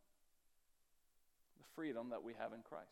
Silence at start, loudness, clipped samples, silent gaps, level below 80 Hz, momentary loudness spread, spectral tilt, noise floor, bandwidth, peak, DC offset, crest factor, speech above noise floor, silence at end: 1.6 s; -49 LUFS; under 0.1%; none; -86 dBFS; 12 LU; -6 dB/octave; -76 dBFS; 17 kHz; -32 dBFS; under 0.1%; 20 dB; 28 dB; 0 s